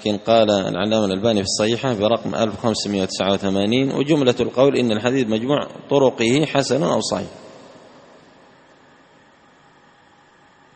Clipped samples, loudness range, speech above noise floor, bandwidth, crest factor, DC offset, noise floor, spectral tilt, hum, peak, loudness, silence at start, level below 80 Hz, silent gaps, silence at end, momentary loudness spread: under 0.1%; 7 LU; 34 dB; 8.8 kHz; 20 dB; under 0.1%; -52 dBFS; -5 dB/octave; none; 0 dBFS; -19 LUFS; 0 s; -56 dBFS; none; 3.1 s; 5 LU